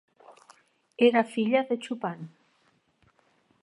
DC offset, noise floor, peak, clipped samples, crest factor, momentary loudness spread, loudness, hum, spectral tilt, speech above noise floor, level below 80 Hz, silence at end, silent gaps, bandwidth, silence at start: under 0.1%; -68 dBFS; -8 dBFS; under 0.1%; 22 dB; 22 LU; -26 LUFS; none; -6 dB/octave; 43 dB; -82 dBFS; 1.35 s; none; 11 kHz; 0.3 s